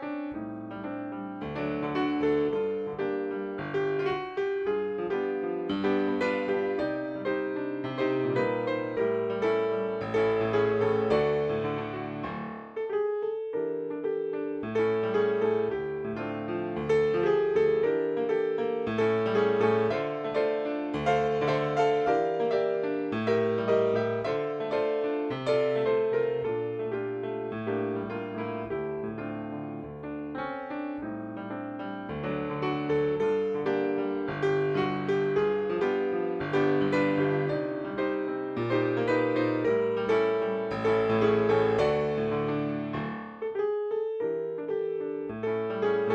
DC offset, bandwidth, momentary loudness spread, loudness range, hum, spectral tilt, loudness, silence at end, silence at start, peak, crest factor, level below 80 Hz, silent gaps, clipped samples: under 0.1%; 8 kHz; 10 LU; 6 LU; none; -7.5 dB/octave; -29 LUFS; 0 s; 0 s; -12 dBFS; 16 dB; -60 dBFS; none; under 0.1%